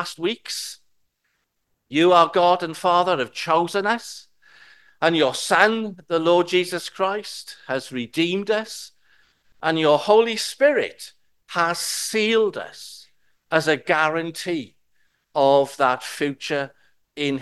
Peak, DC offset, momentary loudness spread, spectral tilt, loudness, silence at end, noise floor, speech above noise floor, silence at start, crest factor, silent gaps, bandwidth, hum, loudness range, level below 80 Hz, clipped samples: 0 dBFS; 0.1%; 17 LU; -3.5 dB/octave; -21 LUFS; 0 s; -73 dBFS; 52 dB; 0 s; 22 dB; none; 12.5 kHz; none; 3 LU; -72 dBFS; under 0.1%